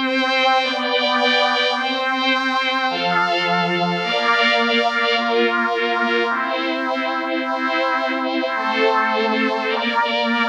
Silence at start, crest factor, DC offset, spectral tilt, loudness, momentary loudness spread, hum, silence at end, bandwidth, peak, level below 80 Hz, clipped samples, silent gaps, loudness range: 0 s; 14 dB; under 0.1%; -4 dB/octave; -18 LUFS; 5 LU; none; 0 s; 10 kHz; -6 dBFS; -80 dBFS; under 0.1%; none; 2 LU